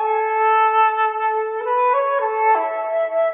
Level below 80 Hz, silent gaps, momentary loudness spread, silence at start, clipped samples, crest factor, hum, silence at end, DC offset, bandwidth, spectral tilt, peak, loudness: -72 dBFS; none; 6 LU; 0 s; under 0.1%; 12 dB; none; 0 s; under 0.1%; 3.7 kHz; -5.5 dB/octave; -6 dBFS; -18 LUFS